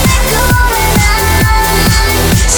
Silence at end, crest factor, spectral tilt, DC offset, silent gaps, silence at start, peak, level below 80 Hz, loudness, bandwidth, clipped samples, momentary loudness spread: 0 s; 8 dB; -3.5 dB/octave; under 0.1%; none; 0 s; 0 dBFS; -14 dBFS; -9 LUFS; over 20 kHz; under 0.1%; 1 LU